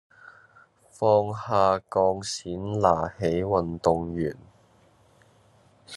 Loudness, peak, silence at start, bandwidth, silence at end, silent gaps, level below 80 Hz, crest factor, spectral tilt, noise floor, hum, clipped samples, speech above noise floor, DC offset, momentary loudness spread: -25 LUFS; -4 dBFS; 0.25 s; 12 kHz; 0 s; none; -60 dBFS; 22 dB; -6 dB/octave; -59 dBFS; none; under 0.1%; 35 dB; under 0.1%; 9 LU